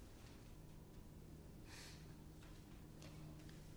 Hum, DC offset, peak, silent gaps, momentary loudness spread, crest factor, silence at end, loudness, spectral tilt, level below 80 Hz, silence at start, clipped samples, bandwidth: none; under 0.1%; -42 dBFS; none; 4 LU; 16 dB; 0 s; -59 LUFS; -5 dB/octave; -62 dBFS; 0 s; under 0.1%; over 20 kHz